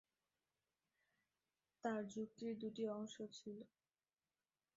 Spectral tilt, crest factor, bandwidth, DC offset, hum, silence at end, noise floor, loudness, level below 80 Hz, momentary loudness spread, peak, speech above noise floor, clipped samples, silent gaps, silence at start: -5 dB/octave; 22 dB; 7.6 kHz; under 0.1%; none; 1.1 s; under -90 dBFS; -49 LUFS; under -90 dBFS; 10 LU; -30 dBFS; over 42 dB; under 0.1%; none; 1.85 s